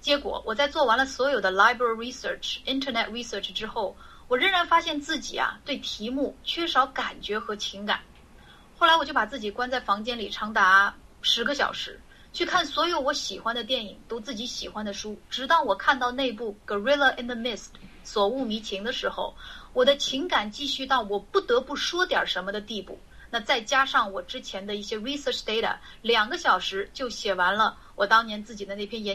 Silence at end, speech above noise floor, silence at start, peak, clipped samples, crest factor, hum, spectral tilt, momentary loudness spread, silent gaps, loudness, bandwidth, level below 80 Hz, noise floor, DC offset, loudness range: 0 s; 25 dB; 0 s; -6 dBFS; under 0.1%; 22 dB; none; -2.5 dB/octave; 12 LU; none; -26 LUFS; 15.5 kHz; -54 dBFS; -51 dBFS; 0.1%; 4 LU